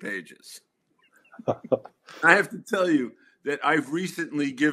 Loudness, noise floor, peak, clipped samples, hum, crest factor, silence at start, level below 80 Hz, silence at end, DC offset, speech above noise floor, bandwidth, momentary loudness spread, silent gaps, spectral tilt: -25 LUFS; -65 dBFS; -2 dBFS; under 0.1%; none; 24 dB; 0 s; -74 dBFS; 0 s; under 0.1%; 39 dB; 14 kHz; 17 LU; none; -5 dB/octave